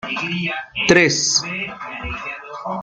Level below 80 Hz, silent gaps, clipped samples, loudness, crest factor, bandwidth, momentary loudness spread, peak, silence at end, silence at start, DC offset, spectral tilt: -44 dBFS; none; under 0.1%; -18 LUFS; 20 dB; 10 kHz; 16 LU; 0 dBFS; 0 s; 0.05 s; under 0.1%; -2.5 dB/octave